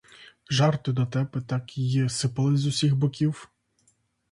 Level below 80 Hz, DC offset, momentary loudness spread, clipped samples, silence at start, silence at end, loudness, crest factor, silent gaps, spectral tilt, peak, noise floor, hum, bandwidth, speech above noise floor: -60 dBFS; under 0.1%; 6 LU; under 0.1%; 0.2 s; 0.85 s; -25 LUFS; 18 dB; none; -6 dB/octave; -8 dBFS; -68 dBFS; none; 11.5 kHz; 44 dB